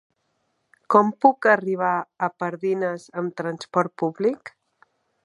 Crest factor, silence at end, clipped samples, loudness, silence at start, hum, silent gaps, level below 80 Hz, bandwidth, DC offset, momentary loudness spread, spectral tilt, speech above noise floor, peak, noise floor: 22 dB; 0.75 s; under 0.1%; -22 LUFS; 0.9 s; none; none; -78 dBFS; 11 kHz; under 0.1%; 11 LU; -7 dB/octave; 50 dB; -2 dBFS; -72 dBFS